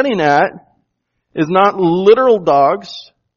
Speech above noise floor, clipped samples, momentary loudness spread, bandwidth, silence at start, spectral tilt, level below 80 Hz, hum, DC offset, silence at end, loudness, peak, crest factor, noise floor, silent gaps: 58 dB; under 0.1%; 16 LU; 7.2 kHz; 0 s; -6.5 dB/octave; -58 dBFS; none; under 0.1%; 0.35 s; -12 LUFS; 0 dBFS; 14 dB; -70 dBFS; none